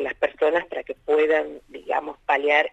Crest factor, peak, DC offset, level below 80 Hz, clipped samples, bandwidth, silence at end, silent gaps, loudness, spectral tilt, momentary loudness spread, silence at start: 18 dB; -6 dBFS; under 0.1%; -60 dBFS; under 0.1%; 8 kHz; 0.05 s; none; -23 LUFS; -4 dB/octave; 13 LU; 0 s